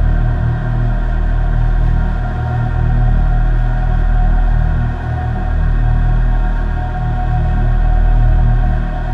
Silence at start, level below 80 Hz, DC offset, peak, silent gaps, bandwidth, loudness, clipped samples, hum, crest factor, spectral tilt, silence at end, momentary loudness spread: 0 s; -14 dBFS; under 0.1%; -2 dBFS; none; 3.9 kHz; -17 LUFS; under 0.1%; none; 10 dB; -9 dB/octave; 0 s; 4 LU